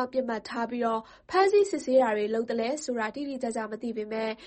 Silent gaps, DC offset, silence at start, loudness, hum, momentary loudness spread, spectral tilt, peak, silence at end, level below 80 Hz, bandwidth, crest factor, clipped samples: none; under 0.1%; 0 s; -28 LUFS; none; 10 LU; -4 dB/octave; -10 dBFS; 0 s; -68 dBFS; 8.8 kHz; 18 dB; under 0.1%